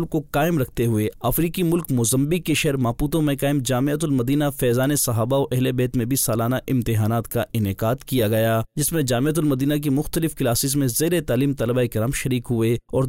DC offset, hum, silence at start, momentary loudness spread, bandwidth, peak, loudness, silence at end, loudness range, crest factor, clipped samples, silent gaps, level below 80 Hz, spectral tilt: 0.2%; none; 0 s; 3 LU; 16 kHz; -12 dBFS; -21 LUFS; 0 s; 1 LU; 10 dB; under 0.1%; none; -42 dBFS; -5.5 dB/octave